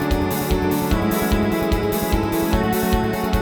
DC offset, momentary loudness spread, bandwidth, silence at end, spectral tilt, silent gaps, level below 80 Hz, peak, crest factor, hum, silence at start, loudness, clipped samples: under 0.1%; 1 LU; over 20 kHz; 0 s; -5.5 dB/octave; none; -26 dBFS; -6 dBFS; 14 dB; none; 0 s; -20 LUFS; under 0.1%